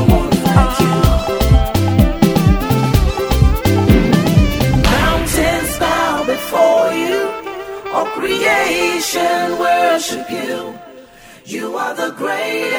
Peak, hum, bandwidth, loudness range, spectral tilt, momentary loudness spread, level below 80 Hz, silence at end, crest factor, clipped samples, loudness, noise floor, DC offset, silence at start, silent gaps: 0 dBFS; none; over 20 kHz; 4 LU; -5.5 dB/octave; 10 LU; -22 dBFS; 0 s; 14 dB; under 0.1%; -15 LUFS; -40 dBFS; under 0.1%; 0 s; none